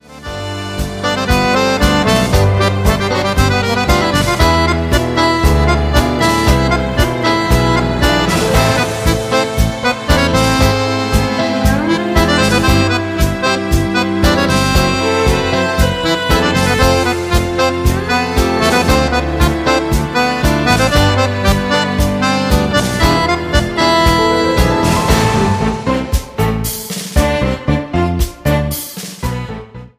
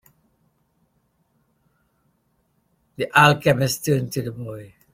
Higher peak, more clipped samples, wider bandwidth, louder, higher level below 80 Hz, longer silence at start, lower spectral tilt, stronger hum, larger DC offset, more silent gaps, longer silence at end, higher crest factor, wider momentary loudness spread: about the same, 0 dBFS vs -2 dBFS; neither; about the same, 15.5 kHz vs 16.5 kHz; first, -13 LUFS vs -19 LUFS; first, -20 dBFS vs -58 dBFS; second, 0.1 s vs 3 s; about the same, -5 dB/octave vs -5 dB/octave; neither; neither; neither; second, 0.1 s vs 0.25 s; second, 12 dB vs 24 dB; second, 6 LU vs 20 LU